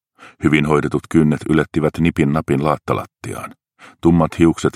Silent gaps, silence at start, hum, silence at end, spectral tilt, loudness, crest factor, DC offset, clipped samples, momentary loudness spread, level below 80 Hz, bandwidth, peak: none; 0.2 s; none; 0.05 s; -7 dB/octave; -17 LUFS; 16 dB; under 0.1%; under 0.1%; 14 LU; -40 dBFS; 14 kHz; 0 dBFS